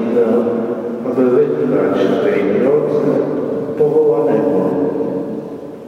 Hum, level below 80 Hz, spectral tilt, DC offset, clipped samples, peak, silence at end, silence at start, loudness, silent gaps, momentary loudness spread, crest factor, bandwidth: none; -60 dBFS; -8.5 dB/octave; under 0.1%; under 0.1%; -2 dBFS; 0 s; 0 s; -15 LUFS; none; 8 LU; 12 dB; 6.6 kHz